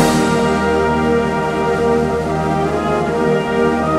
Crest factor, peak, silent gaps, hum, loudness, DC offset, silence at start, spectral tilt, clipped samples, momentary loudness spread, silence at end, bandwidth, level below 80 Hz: 14 dB; 0 dBFS; none; none; -16 LUFS; under 0.1%; 0 s; -6 dB/octave; under 0.1%; 3 LU; 0 s; 15.5 kHz; -34 dBFS